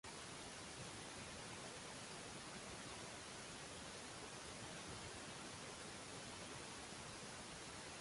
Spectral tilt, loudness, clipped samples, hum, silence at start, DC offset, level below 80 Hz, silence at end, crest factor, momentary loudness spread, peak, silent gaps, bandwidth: -2.5 dB/octave; -52 LUFS; under 0.1%; none; 0.05 s; under 0.1%; -70 dBFS; 0 s; 16 dB; 1 LU; -38 dBFS; none; 11.5 kHz